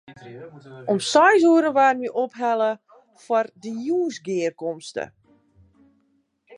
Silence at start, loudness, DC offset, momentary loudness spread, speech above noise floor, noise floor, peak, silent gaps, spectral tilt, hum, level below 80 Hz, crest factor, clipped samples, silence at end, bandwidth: 0.1 s; -21 LUFS; under 0.1%; 22 LU; 45 dB; -67 dBFS; -4 dBFS; none; -4 dB/octave; none; -72 dBFS; 18 dB; under 0.1%; 0 s; 11 kHz